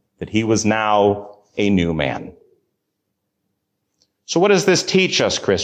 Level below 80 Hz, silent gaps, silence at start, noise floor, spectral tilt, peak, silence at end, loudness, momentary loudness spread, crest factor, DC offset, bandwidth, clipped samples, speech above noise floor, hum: -44 dBFS; none; 0.2 s; -75 dBFS; -4.5 dB/octave; -4 dBFS; 0 s; -17 LUFS; 9 LU; 16 dB; under 0.1%; 15 kHz; under 0.1%; 58 dB; none